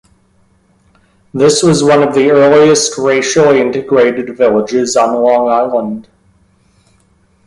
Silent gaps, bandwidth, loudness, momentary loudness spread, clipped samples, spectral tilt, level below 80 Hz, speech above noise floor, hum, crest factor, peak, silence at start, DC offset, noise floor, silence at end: none; 11.5 kHz; -10 LUFS; 6 LU; under 0.1%; -4.5 dB/octave; -50 dBFS; 43 dB; none; 12 dB; 0 dBFS; 1.35 s; under 0.1%; -52 dBFS; 1.45 s